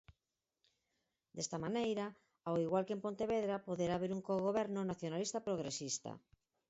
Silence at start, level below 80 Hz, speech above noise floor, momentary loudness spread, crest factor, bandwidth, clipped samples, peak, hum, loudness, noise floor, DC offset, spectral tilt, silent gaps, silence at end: 0.1 s; -72 dBFS; over 51 dB; 8 LU; 18 dB; 8 kHz; under 0.1%; -24 dBFS; none; -40 LUFS; under -90 dBFS; under 0.1%; -5.5 dB/octave; none; 0.5 s